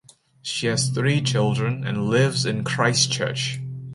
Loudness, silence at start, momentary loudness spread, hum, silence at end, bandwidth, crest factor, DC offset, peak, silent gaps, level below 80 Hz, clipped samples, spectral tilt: -22 LUFS; 0.45 s; 8 LU; none; 0 s; 11.5 kHz; 18 dB; under 0.1%; -6 dBFS; none; -58 dBFS; under 0.1%; -4 dB/octave